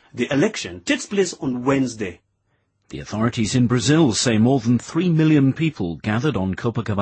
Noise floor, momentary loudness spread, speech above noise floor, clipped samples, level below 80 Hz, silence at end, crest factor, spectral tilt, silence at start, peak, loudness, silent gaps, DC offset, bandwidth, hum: -68 dBFS; 10 LU; 49 dB; under 0.1%; -50 dBFS; 0 s; 14 dB; -5.5 dB/octave; 0.15 s; -6 dBFS; -20 LUFS; none; under 0.1%; 8.8 kHz; none